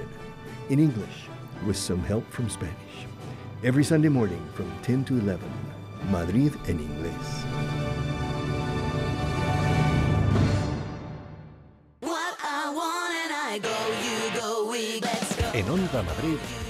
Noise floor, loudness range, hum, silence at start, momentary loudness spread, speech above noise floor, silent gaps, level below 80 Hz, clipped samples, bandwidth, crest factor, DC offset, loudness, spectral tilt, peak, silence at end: -52 dBFS; 3 LU; none; 0 s; 15 LU; 25 dB; none; -44 dBFS; under 0.1%; 15 kHz; 18 dB; under 0.1%; -27 LUFS; -5.5 dB/octave; -8 dBFS; 0 s